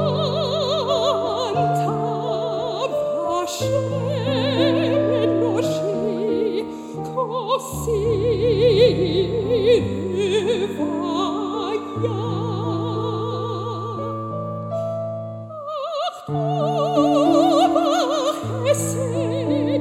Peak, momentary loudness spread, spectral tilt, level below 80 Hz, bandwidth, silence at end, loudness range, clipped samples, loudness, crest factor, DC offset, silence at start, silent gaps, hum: -4 dBFS; 10 LU; -6 dB/octave; -48 dBFS; 16.5 kHz; 0 s; 7 LU; under 0.1%; -21 LUFS; 18 dB; under 0.1%; 0 s; none; none